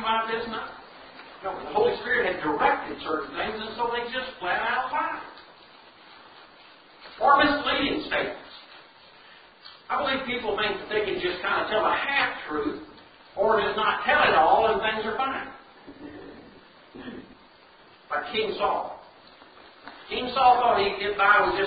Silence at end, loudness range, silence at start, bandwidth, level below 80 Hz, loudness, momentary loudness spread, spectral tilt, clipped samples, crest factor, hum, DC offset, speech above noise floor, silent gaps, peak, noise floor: 0 s; 9 LU; 0 s; 5 kHz; -56 dBFS; -25 LUFS; 24 LU; -8 dB/octave; under 0.1%; 22 dB; none; under 0.1%; 29 dB; none; -6 dBFS; -53 dBFS